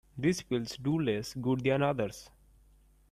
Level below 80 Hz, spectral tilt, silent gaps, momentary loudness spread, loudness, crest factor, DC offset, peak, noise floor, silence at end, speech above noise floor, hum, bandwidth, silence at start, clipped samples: -60 dBFS; -6 dB/octave; none; 6 LU; -32 LUFS; 16 dB; under 0.1%; -16 dBFS; -62 dBFS; 0.85 s; 31 dB; none; 15.5 kHz; 0.15 s; under 0.1%